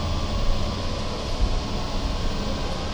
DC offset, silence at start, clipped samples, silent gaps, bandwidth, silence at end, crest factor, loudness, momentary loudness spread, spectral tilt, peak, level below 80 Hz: under 0.1%; 0 s; under 0.1%; none; 19.5 kHz; 0 s; 14 dB; -28 LUFS; 2 LU; -5 dB/octave; -10 dBFS; -26 dBFS